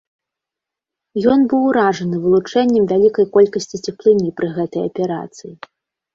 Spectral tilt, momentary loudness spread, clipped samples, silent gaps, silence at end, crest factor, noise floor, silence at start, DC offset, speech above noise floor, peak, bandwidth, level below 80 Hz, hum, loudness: -6.5 dB/octave; 13 LU; under 0.1%; none; 0.6 s; 16 dB; -85 dBFS; 1.15 s; under 0.1%; 69 dB; -2 dBFS; 7.6 kHz; -56 dBFS; none; -16 LUFS